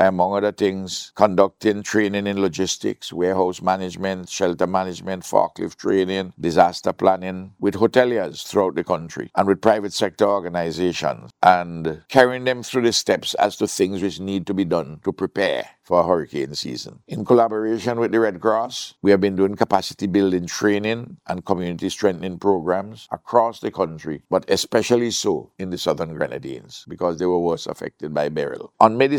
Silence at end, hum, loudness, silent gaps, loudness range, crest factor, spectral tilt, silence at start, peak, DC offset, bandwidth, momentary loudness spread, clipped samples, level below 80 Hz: 0 s; none; -21 LUFS; none; 3 LU; 20 dB; -5 dB/octave; 0 s; 0 dBFS; under 0.1%; 17.5 kHz; 10 LU; under 0.1%; -58 dBFS